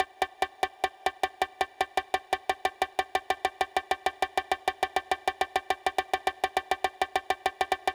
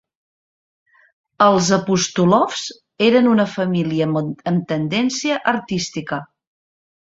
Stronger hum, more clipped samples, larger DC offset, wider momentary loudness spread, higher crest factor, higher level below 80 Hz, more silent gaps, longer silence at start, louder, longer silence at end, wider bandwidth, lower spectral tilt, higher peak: neither; neither; neither; second, 2 LU vs 10 LU; about the same, 18 dB vs 18 dB; about the same, -60 dBFS vs -58 dBFS; neither; second, 0 s vs 1.4 s; second, -30 LUFS vs -18 LUFS; second, 0 s vs 0.8 s; first, over 20 kHz vs 8 kHz; second, -2 dB/octave vs -5 dB/octave; second, -14 dBFS vs -2 dBFS